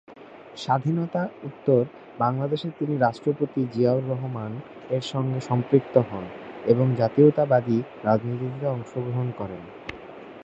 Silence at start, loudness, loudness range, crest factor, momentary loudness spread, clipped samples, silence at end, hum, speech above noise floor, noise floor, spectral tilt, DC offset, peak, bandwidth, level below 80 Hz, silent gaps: 0.1 s; -24 LUFS; 4 LU; 22 dB; 15 LU; under 0.1%; 0 s; none; 21 dB; -45 dBFS; -8.5 dB/octave; under 0.1%; -4 dBFS; 8 kHz; -62 dBFS; none